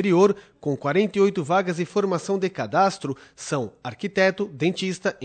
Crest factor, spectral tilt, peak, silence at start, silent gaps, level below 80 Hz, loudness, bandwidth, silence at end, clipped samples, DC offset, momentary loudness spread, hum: 18 dB; -5.5 dB/octave; -6 dBFS; 0 s; none; -66 dBFS; -23 LUFS; 9.2 kHz; 0 s; under 0.1%; under 0.1%; 10 LU; none